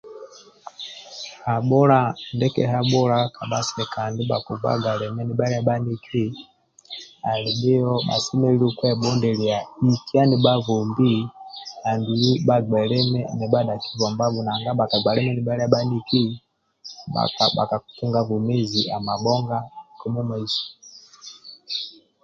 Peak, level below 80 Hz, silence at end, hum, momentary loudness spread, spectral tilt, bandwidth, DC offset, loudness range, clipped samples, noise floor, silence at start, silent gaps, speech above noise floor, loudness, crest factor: -2 dBFS; -58 dBFS; 0.35 s; none; 17 LU; -6 dB/octave; 7.6 kHz; under 0.1%; 5 LU; under 0.1%; -45 dBFS; 0.05 s; none; 24 dB; -22 LUFS; 20 dB